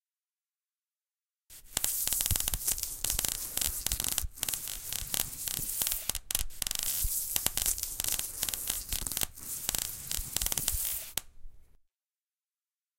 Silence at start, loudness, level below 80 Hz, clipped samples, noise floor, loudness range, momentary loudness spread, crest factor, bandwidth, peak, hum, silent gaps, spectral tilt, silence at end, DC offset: 1.5 s; -31 LUFS; -46 dBFS; under 0.1%; under -90 dBFS; 3 LU; 5 LU; 30 dB; 17 kHz; -6 dBFS; none; none; -0.5 dB/octave; 1.4 s; under 0.1%